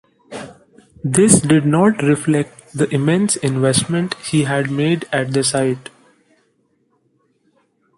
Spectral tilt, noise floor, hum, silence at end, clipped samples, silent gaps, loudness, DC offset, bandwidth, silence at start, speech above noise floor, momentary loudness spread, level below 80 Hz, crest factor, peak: -5 dB/octave; -63 dBFS; none; 2.15 s; under 0.1%; none; -16 LUFS; under 0.1%; 16 kHz; 0.3 s; 47 dB; 16 LU; -52 dBFS; 18 dB; 0 dBFS